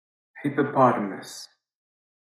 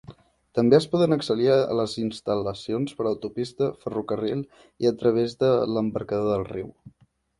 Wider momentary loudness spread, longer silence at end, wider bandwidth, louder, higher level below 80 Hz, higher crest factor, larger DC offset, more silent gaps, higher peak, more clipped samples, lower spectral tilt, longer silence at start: first, 19 LU vs 11 LU; first, 0.75 s vs 0.5 s; first, 13.5 kHz vs 11.5 kHz; about the same, -24 LUFS vs -24 LUFS; second, under -90 dBFS vs -58 dBFS; about the same, 20 dB vs 20 dB; neither; neither; about the same, -6 dBFS vs -4 dBFS; neither; about the same, -6.5 dB/octave vs -7 dB/octave; first, 0.35 s vs 0.1 s